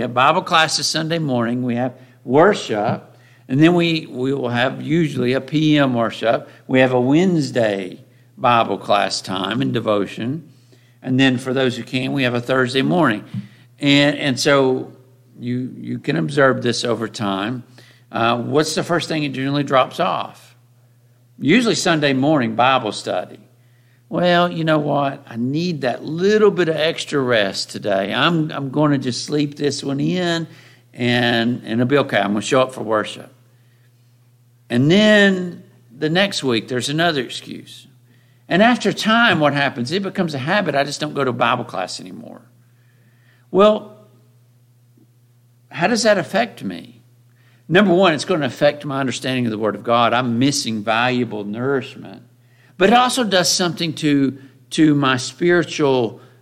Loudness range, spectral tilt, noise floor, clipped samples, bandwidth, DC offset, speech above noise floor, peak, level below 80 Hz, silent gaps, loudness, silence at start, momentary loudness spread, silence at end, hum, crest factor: 4 LU; -5 dB/octave; -53 dBFS; under 0.1%; 15.5 kHz; under 0.1%; 36 dB; 0 dBFS; -62 dBFS; none; -18 LUFS; 0 s; 11 LU; 0.25 s; none; 18 dB